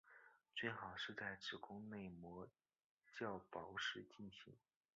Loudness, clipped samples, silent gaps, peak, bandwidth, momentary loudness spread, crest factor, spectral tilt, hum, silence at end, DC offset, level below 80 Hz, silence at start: -51 LUFS; under 0.1%; 2.84-2.97 s; -30 dBFS; 7.4 kHz; 16 LU; 24 dB; -2 dB/octave; none; 0.35 s; under 0.1%; -80 dBFS; 0.05 s